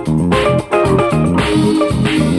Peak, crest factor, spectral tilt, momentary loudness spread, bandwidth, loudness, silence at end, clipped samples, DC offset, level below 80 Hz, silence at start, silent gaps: -2 dBFS; 12 dB; -6.5 dB/octave; 1 LU; 12.5 kHz; -13 LUFS; 0 s; under 0.1%; under 0.1%; -30 dBFS; 0 s; none